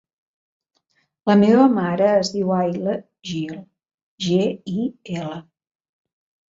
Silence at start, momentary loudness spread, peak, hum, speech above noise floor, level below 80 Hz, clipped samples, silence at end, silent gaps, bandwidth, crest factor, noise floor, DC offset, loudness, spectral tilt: 1.25 s; 16 LU; -4 dBFS; none; 49 dB; -64 dBFS; under 0.1%; 1.1 s; 3.94-4.18 s; 7.8 kHz; 18 dB; -68 dBFS; under 0.1%; -20 LUFS; -6.5 dB/octave